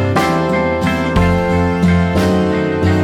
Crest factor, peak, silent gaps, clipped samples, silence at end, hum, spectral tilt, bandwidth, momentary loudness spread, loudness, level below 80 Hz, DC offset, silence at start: 10 dB; -2 dBFS; none; under 0.1%; 0 s; none; -7 dB/octave; 14 kHz; 2 LU; -14 LUFS; -28 dBFS; under 0.1%; 0 s